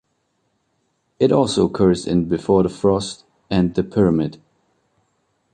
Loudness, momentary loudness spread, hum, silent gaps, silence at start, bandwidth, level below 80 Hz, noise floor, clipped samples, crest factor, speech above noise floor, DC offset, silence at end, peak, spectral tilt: -19 LUFS; 6 LU; none; none; 1.2 s; 9.8 kHz; -44 dBFS; -69 dBFS; under 0.1%; 18 dB; 51 dB; under 0.1%; 1.2 s; -2 dBFS; -7 dB/octave